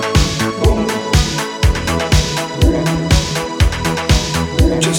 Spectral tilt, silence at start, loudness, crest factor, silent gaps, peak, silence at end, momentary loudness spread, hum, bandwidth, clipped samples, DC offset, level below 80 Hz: -4.5 dB/octave; 0 s; -15 LUFS; 14 dB; none; 0 dBFS; 0 s; 3 LU; none; 18 kHz; under 0.1%; under 0.1%; -20 dBFS